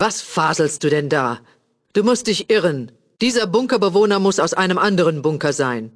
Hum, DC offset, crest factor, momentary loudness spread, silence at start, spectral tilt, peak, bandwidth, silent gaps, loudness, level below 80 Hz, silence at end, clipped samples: none; under 0.1%; 16 dB; 6 LU; 0 s; -4.5 dB/octave; -2 dBFS; 11 kHz; none; -18 LUFS; -60 dBFS; 0.05 s; under 0.1%